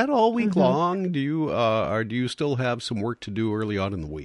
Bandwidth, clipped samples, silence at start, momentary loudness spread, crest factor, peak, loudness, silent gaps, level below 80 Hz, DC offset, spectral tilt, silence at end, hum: 11.5 kHz; under 0.1%; 0 s; 8 LU; 16 dB; -8 dBFS; -24 LUFS; none; -50 dBFS; under 0.1%; -7 dB/octave; 0 s; none